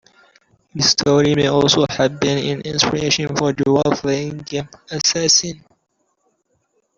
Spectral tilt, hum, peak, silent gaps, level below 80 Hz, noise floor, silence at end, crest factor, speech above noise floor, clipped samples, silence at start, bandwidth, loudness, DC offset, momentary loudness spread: -3.5 dB/octave; none; -2 dBFS; none; -50 dBFS; -68 dBFS; 1.4 s; 18 dB; 50 dB; under 0.1%; 0.75 s; 7.6 kHz; -17 LUFS; under 0.1%; 12 LU